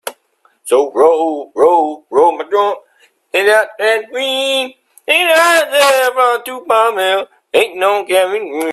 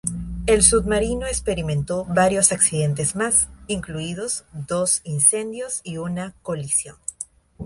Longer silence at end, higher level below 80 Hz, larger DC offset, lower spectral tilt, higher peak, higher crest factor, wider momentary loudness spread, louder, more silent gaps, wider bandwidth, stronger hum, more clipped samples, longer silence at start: about the same, 0 s vs 0 s; second, -66 dBFS vs -38 dBFS; neither; second, -1 dB/octave vs -3.5 dB/octave; about the same, 0 dBFS vs 0 dBFS; second, 14 dB vs 22 dB; second, 9 LU vs 14 LU; first, -13 LUFS vs -20 LUFS; neither; first, 14.5 kHz vs 12 kHz; neither; neither; about the same, 0.05 s vs 0.05 s